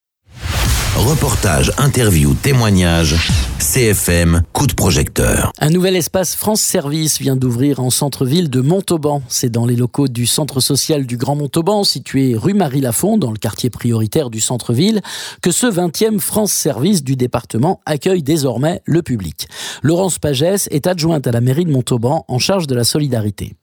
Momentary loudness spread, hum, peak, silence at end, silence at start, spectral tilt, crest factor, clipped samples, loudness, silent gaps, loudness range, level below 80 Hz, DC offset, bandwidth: 5 LU; none; 0 dBFS; 0.1 s; 0.35 s; -4.5 dB/octave; 14 dB; under 0.1%; -15 LUFS; none; 3 LU; -28 dBFS; under 0.1%; over 20 kHz